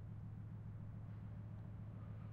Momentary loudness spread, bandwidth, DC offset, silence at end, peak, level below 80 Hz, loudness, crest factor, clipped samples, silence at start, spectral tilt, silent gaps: 0 LU; 3.9 kHz; under 0.1%; 0 s; -40 dBFS; -62 dBFS; -52 LUFS; 10 dB; under 0.1%; 0 s; -10 dB/octave; none